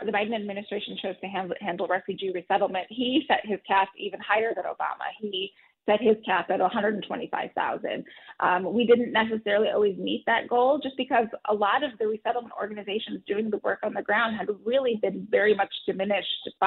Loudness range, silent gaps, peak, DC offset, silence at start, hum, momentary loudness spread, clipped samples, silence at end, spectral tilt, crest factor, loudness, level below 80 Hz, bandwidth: 4 LU; none; -10 dBFS; under 0.1%; 0 s; none; 9 LU; under 0.1%; 0 s; -2 dB/octave; 18 dB; -27 LUFS; -70 dBFS; 4.3 kHz